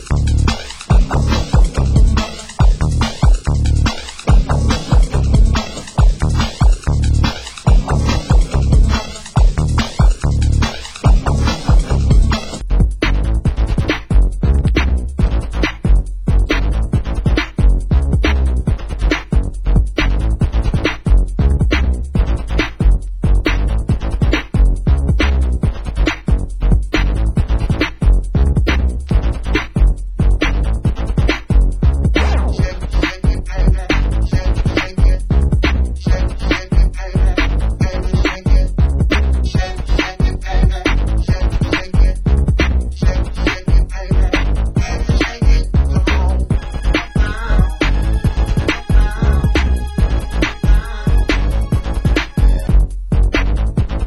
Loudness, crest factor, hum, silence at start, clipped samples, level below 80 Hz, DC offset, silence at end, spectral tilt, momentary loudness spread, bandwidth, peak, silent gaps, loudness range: -16 LUFS; 14 dB; none; 0 s; under 0.1%; -14 dBFS; under 0.1%; 0 s; -6 dB/octave; 4 LU; 10.5 kHz; 0 dBFS; none; 1 LU